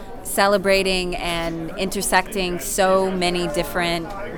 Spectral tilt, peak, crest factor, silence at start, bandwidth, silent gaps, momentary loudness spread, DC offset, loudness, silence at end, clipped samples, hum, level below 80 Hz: -3.5 dB/octave; -2 dBFS; 18 dB; 0 s; over 20 kHz; none; 8 LU; under 0.1%; -21 LUFS; 0 s; under 0.1%; none; -36 dBFS